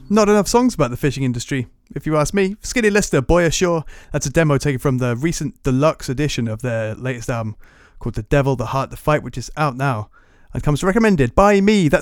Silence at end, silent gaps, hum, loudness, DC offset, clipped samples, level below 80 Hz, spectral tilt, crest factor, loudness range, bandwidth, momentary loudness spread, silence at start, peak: 0 s; none; none; -18 LUFS; under 0.1%; under 0.1%; -34 dBFS; -5.5 dB/octave; 18 dB; 4 LU; 18 kHz; 11 LU; 0 s; 0 dBFS